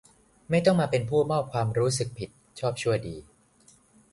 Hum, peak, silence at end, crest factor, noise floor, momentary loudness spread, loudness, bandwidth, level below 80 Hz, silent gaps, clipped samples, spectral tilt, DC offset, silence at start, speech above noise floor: none; -8 dBFS; 0.9 s; 20 dB; -60 dBFS; 17 LU; -26 LUFS; 11.5 kHz; -56 dBFS; none; under 0.1%; -5.5 dB/octave; under 0.1%; 0.5 s; 34 dB